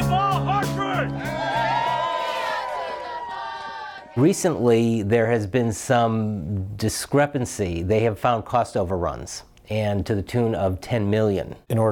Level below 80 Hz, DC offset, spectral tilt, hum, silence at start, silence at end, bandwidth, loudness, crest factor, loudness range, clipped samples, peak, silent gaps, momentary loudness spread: -46 dBFS; under 0.1%; -6 dB/octave; none; 0 s; 0 s; 18 kHz; -23 LUFS; 16 dB; 3 LU; under 0.1%; -8 dBFS; none; 11 LU